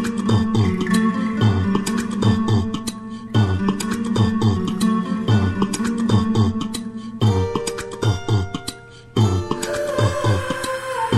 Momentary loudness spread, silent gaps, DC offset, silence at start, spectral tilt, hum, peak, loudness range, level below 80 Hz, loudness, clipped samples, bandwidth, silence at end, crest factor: 8 LU; none; under 0.1%; 0 s; -6 dB/octave; none; -4 dBFS; 2 LU; -44 dBFS; -20 LUFS; under 0.1%; 13.5 kHz; 0 s; 16 dB